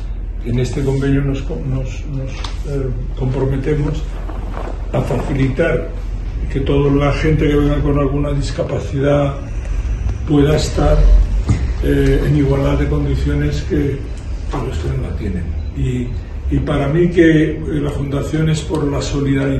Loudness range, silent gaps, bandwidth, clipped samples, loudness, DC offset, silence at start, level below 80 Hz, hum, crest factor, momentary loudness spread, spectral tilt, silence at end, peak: 5 LU; none; 12 kHz; under 0.1%; -18 LUFS; under 0.1%; 0 s; -20 dBFS; none; 16 dB; 11 LU; -7.5 dB/octave; 0 s; 0 dBFS